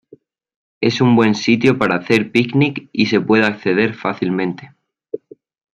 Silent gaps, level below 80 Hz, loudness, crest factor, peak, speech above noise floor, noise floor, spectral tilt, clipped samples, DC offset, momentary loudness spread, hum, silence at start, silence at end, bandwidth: none; -58 dBFS; -16 LUFS; 16 dB; 0 dBFS; 33 dB; -48 dBFS; -6.5 dB/octave; under 0.1%; under 0.1%; 15 LU; none; 0.8 s; 0.6 s; 9.8 kHz